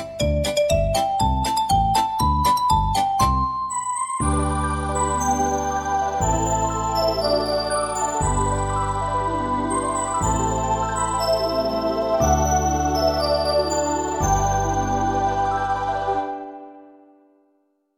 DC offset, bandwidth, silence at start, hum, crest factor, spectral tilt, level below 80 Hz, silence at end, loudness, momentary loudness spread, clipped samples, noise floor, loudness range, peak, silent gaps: under 0.1%; 17 kHz; 0 s; none; 16 dB; -4.5 dB/octave; -32 dBFS; 1.1 s; -21 LUFS; 4 LU; under 0.1%; -66 dBFS; 2 LU; -6 dBFS; none